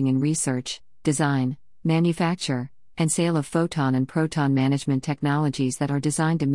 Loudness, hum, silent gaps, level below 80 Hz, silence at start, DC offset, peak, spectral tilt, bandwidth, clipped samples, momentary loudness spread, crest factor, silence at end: -24 LUFS; none; none; -60 dBFS; 0 s; 0.2%; -8 dBFS; -5.5 dB/octave; 12 kHz; under 0.1%; 7 LU; 16 dB; 0 s